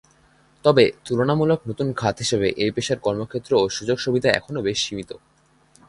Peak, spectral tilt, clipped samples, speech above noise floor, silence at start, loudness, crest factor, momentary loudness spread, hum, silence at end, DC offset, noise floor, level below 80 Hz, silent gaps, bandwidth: 0 dBFS; -5 dB/octave; under 0.1%; 36 dB; 0.65 s; -21 LUFS; 22 dB; 8 LU; none; 0.7 s; under 0.1%; -57 dBFS; -52 dBFS; none; 11.5 kHz